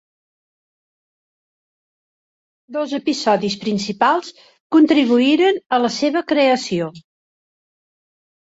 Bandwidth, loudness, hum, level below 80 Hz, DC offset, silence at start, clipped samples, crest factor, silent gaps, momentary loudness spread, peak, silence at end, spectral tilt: 8 kHz; -17 LUFS; none; -64 dBFS; under 0.1%; 2.7 s; under 0.1%; 18 dB; 4.60-4.70 s; 10 LU; -2 dBFS; 1.55 s; -4.5 dB/octave